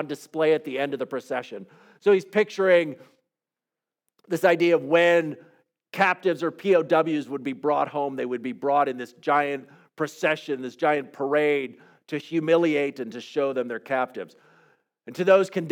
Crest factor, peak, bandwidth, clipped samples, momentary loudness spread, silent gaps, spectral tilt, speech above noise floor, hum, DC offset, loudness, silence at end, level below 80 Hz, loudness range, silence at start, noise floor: 18 dB; -6 dBFS; 17 kHz; under 0.1%; 13 LU; none; -5.5 dB/octave; 65 dB; none; under 0.1%; -24 LUFS; 0 s; -86 dBFS; 4 LU; 0 s; -89 dBFS